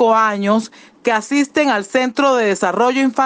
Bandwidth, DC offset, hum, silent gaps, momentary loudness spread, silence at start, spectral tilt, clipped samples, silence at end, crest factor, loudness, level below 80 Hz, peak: 9.8 kHz; under 0.1%; none; none; 4 LU; 0 s; -4.5 dB/octave; under 0.1%; 0 s; 14 dB; -16 LUFS; -64 dBFS; -2 dBFS